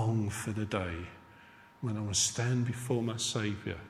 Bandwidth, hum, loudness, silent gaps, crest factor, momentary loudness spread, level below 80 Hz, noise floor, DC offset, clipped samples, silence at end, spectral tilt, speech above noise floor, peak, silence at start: 15 kHz; none; -33 LUFS; none; 18 dB; 10 LU; -54 dBFS; -57 dBFS; under 0.1%; under 0.1%; 0 s; -4 dB/octave; 23 dB; -16 dBFS; 0 s